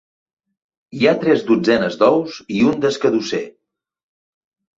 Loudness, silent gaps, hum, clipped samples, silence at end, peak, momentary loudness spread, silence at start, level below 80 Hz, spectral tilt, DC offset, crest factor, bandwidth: -17 LUFS; none; none; under 0.1%; 1.3 s; -2 dBFS; 10 LU; 0.95 s; -58 dBFS; -5.5 dB/octave; under 0.1%; 18 dB; 7.8 kHz